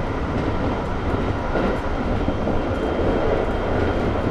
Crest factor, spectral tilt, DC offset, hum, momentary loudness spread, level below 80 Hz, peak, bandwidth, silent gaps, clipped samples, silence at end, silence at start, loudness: 14 dB; -8 dB/octave; under 0.1%; none; 3 LU; -28 dBFS; -8 dBFS; 9.4 kHz; none; under 0.1%; 0 s; 0 s; -23 LUFS